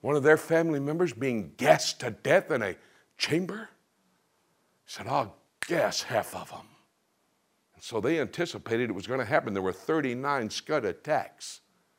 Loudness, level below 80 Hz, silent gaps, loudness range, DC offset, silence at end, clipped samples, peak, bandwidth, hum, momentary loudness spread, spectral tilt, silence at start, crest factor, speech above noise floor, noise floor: -28 LUFS; -72 dBFS; none; 6 LU; under 0.1%; 0.4 s; under 0.1%; -4 dBFS; 16 kHz; none; 18 LU; -4.5 dB/octave; 0.05 s; 24 dB; 44 dB; -73 dBFS